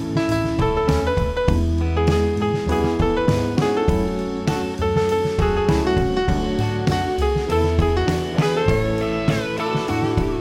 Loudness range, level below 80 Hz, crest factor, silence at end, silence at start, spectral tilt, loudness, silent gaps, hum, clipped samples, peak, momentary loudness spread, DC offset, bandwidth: 1 LU; -28 dBFS; 16 dB; 0 s; 0 s; -7 dB/octave; -20 LUFS; none; none; under 0.1%; -2 dBFS; 3 LU; under 0.1%; 15.5 kHz